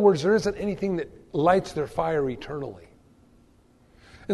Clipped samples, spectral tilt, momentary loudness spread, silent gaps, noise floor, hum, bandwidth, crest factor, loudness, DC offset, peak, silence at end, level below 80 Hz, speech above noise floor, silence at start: under 0.1%; -6.5 dB/octave; 13 LU; none; -58 dBFS; none; 12 kHz; 20 dB; -26 LUFS; under 0.1%; -6 dBFS; 0 s; -52 dBFS; 34 dB; 0 s